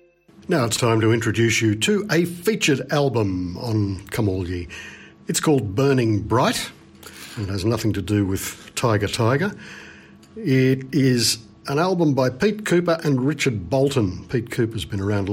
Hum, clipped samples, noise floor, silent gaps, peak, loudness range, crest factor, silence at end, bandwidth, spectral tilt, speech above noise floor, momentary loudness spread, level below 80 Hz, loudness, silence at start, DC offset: none; under 0.1%; -45 dBFS; none; -6 dBFS; 3 LU; 14 dB; 0 s; 16.5 kHz; -5 dB/octave; 25 dB; 11 LU; -48 dBFS; -21 LUFS; 0.5 s; under 0.1%